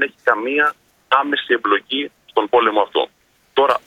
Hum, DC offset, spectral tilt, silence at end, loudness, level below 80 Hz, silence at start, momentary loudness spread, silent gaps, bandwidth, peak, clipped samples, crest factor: none; under 0.1%; -4 dB/octave; 0.1 s; -18 LUFS; -68 dBFS; 0 s; 7 LU; none; 14 kHz; 0 dBFS; under 0.1%; 18 dB